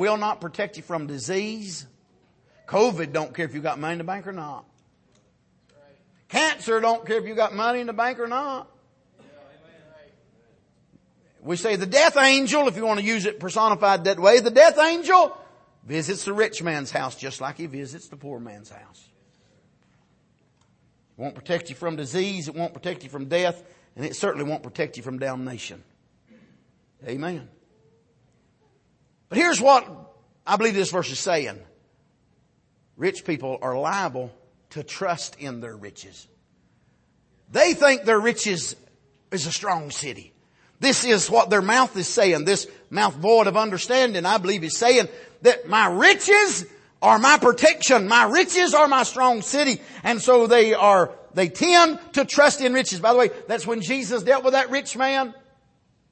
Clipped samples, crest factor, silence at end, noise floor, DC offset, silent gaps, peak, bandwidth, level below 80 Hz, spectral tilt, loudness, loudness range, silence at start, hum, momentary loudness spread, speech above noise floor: under 0.1%; 20 dB; 0.8 s; -64 dBFS; under 0.1%; none; -2 dBFS; 8.8 kHz; -68 dBFS; -3 dB/octave; -20 LUFS; 16 LU; 0 s; none; 19 LU; 43 dB